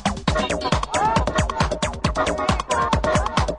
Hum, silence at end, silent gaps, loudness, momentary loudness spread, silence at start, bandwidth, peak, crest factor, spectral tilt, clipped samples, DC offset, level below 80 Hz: none; 0 s; none; -21 LUFS; 3 LU; 0 s; 11 kHz; -4 dBFS; 18 dB; -4.5 dB/octave; under 0.1%; under 0.1%; -30 dBFS